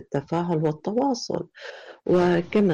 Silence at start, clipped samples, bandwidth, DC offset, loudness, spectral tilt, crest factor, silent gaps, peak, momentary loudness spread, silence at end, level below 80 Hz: 0 s; under 0.1%; 7.8 kHz; under 0.1%; -24 LUFS; -7 dB/octave; 12 dB; none; -12 dBFS; 16 LU; 0 s; -58 dBFS